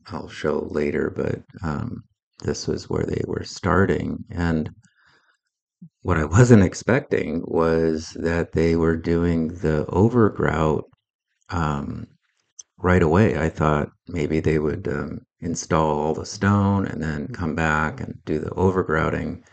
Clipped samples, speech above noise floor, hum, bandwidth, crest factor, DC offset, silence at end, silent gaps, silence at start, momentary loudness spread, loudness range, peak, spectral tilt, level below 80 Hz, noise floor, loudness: under 0.1%; 43 dB; none; 8.8 kHz; 22 dB; under 0.1%; 0.15 s; 2.23-2.31 s, 5.62-5.67 s, 11.10-11.19 s, 12.52-12.57 s; 0.05 s; 11 LU; 5 LU; 0 dBFS; -7 dB/octave; -40 dBFS; -64 dBFS; -22 LUFS